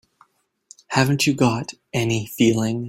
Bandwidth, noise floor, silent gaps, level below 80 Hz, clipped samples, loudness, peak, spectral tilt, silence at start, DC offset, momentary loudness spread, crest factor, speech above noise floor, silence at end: 16.5 kHz; -59 dBFS; none; -54 dBFS; under 0.1%; -20 LUFS; -4 dBFS; -5 dB/octave; 0.9 s; under 0.1%; 7 LU; 18 dB; 39 dB; 0 s